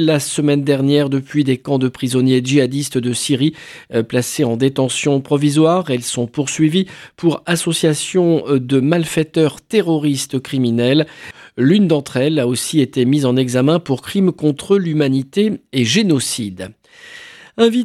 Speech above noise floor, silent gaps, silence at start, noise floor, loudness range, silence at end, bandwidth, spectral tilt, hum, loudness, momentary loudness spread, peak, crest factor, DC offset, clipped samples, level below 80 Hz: 23 dB; none; 0 s; -39 dBFS; 1 LU; 0 s; 14.5 kHz; -5.5 dB/octave; none; -16 LUFS; 6 LU; 0 dBFS; 16 dB; under 0.1%; under 0.1%; -58 dBFS